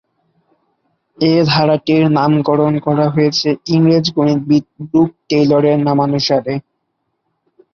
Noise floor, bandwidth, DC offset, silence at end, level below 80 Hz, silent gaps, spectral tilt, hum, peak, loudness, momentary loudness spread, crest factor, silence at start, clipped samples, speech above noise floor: -70 dBFS; 7 kHz; under 0.1%; 1.15 s; -54 dBFS; none; -7 dB/octave; none; -2 dBFS; -14 LUFS; 4 LU; 12 dB; 1.2 s; under 0.1%; 57 dB